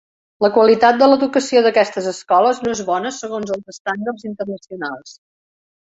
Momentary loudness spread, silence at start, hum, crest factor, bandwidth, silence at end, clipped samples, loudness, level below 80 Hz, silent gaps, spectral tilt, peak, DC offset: 15 LU; 0.4 s; none; 16 dB; 8 kHz; 0.8 s; under 0.1%; -16 LUFS; -60 dBFS; 3.80-3.85 s; -4 dB/octave; -2 dBFS; under 0.1%